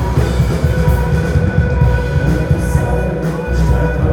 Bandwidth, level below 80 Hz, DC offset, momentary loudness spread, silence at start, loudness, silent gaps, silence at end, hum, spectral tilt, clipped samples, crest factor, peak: 16.5 kHz; -18 dBFS; under 0.1%; 3 LU; 0 s; -15 LUFS; none; 0 s; none; -7.5 dB/octave; under 0.1%; 14 dB; 0 dBFS